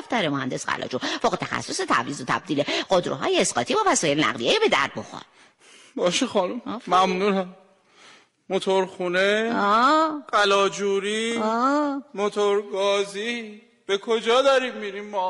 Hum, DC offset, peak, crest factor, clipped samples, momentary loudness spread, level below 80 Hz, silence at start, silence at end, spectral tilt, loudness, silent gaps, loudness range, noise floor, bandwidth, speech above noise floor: none; under 0.1%; -8 dBFS; 16 dB; under 0.1%; 10 LU; -64 dBFS; 0 s; 0 s; -3.5 dB/octave; -23 LUFS; none; 4 LU; -53 dBFS; 11.5 kHz; 30 dB